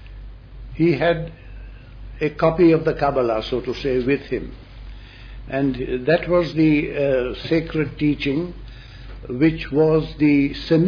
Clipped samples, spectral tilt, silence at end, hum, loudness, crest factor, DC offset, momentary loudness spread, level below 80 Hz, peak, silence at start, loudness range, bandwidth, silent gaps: under 0.1%; -8.5 dB/octave; 0 s; none; -20 LUFS; 16 dB; under 0.1%; 23 LU; -38 dBFS; -6 dBFS; 0 s; 3 LU; 5.4 kHz; none